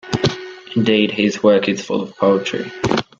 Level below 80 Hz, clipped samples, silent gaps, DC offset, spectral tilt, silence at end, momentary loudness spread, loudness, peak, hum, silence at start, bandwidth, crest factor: -50 dBFS; under 0.1%; none; under 0.1%; -5.5 dB/octave; 0.15 s; 9 LU; -17 LUFS; 0 dBFS; none; 0.05 s; 7.8 kHz; 16 dB